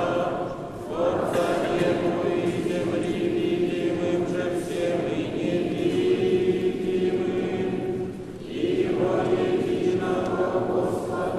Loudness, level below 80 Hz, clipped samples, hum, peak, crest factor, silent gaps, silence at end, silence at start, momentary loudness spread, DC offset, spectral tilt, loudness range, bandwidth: -25 LUFS; -52 dBFS; under 0.1%; none; -12 dBFS; 14 dB; none; 0 s; 0 s; 5 LU; under 0.1%; -6.5 dB/octave; 1 LU; 13 kHz